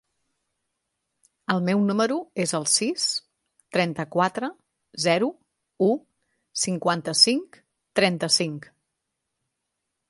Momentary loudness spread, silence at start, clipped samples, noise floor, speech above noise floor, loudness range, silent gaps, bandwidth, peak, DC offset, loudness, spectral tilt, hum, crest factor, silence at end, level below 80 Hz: 12 LU; 1.5 s; under 0.1%; -81 dBFS; 57 dB; 3 LU; none; 11.5 kHz; -2 dBFS; under 0.1%; -23 LUFS; -3.5 dB/octave; none; 24 dB; 1.5 s; -70 dBFS